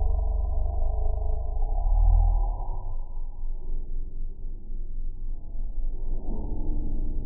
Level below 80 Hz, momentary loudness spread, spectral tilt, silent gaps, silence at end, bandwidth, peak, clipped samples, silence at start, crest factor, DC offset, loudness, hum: -24 dBFS; 15 LU; -6.5 dB/octave; none; 0 s; 1.1 kHz; -10 dBFS; under 0.1%; 0 s; 14 dB; under 0.1%; -32 LUFS; none